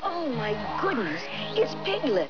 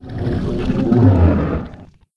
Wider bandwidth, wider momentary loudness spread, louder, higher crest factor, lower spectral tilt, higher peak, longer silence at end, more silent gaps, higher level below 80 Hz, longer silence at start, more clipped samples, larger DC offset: second, 5.4 kHz vs 6 kHz; second, 3 LU vs 12 LU; second, -28 LUFS vs -16 LUFS; about the same, 14 dB vs 16 dB; second, -5.5 dB/octave vs -10 dB/octave; second, -14 dBFS vs 0 dBFS; second, 0 s vs 0.3 s; neither; second, -58 dBFS vs -28 dBFS; about the same, 0 s vs 0 s; neither; first, 0.8% vs under 0.1%